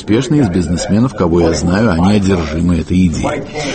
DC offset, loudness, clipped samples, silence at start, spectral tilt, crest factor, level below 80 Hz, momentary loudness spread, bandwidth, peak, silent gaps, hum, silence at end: under 0.1%; -13 LUFS; under 0.1%; 0 s; -6.5 dB/octave; 12 dB; -28 dBFS; 4 LU; 8.8 kHz; 0 dBFS; none; none; 0 s